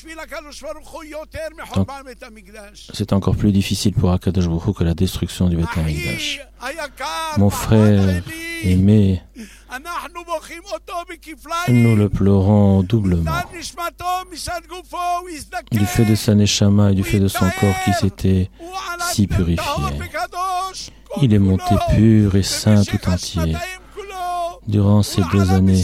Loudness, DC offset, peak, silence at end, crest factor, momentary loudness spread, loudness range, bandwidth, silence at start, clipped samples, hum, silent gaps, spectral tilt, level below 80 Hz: -18 LUFS; under 0.1%; -2 dBFS; 0 s; 14 dB; 17 LU; 4 LU; 15.5 kHz; 0.05 s; under 0.1%; none; none; -6 dB/octave; -34 dBFS